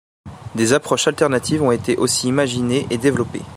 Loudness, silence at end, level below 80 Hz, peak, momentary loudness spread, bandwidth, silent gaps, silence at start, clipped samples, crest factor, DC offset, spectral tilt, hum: -18 LUFS; 0 s; -50 dBFS; -2 dBFS; 4 LU; 16 kHz; none; 0.25 s; under 0.1%; 16 dB; under 0.1%; -4.5 dB/octave; none